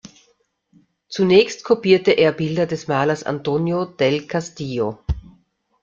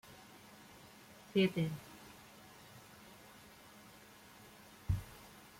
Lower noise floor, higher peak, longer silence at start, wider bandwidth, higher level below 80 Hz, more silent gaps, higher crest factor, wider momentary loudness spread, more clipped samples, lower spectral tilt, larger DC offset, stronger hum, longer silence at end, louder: first, -63 dBFS vs -59 dBFS; first, -2 dBFS vs -20 dBFS; first, 1.1 s vs 0.05 s; second, 7.6 kHz vs 16.5 kHz; first, -40 dBFS vs -58 dBFS; neither; about the same, 18 dB vs 22 dB; second, 12 LU vs 23 LU; neither; about the same, -6 dB/octave vs -6 dB/octave; neither; neither; first, 0.6 s vs 0.2 s; first, -19 LUFS vs -38 LUFS